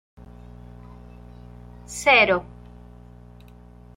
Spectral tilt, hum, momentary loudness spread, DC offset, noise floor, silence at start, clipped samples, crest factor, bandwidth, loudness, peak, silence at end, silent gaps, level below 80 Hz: -3 dB/octave; 60 Hz at -45 dBFS; 29 LU; under 0.1%; -46 dBFS; 1.9 s; under 0.1%; 22 dB; 16 kHz; -18 LUFS; -4 dBFS; 1.55 s; none; -48 dBFS